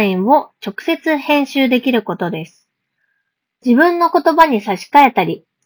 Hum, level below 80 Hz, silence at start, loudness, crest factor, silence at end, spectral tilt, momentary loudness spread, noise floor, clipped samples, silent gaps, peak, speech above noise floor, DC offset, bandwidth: none; -58 dBFS; 0 s; -14 LUFS; 16 dB; 0.3 s; -6 dB/octave; 12 LU; -71 dBFS; 0.2%; none; 0 dBFS; 57 dB; under 0.1%; over 20 kHz